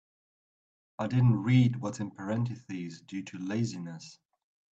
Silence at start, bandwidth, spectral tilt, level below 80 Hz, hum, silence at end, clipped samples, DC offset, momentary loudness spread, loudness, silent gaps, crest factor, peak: 1 s; 7.8 kHz; -7.5 dB/octave; -62 dBFS; none; 0.6 s; under 0.1%; under 0.1%; 17 LU; -30 LUFS; none; 18 dB; -12 dBFS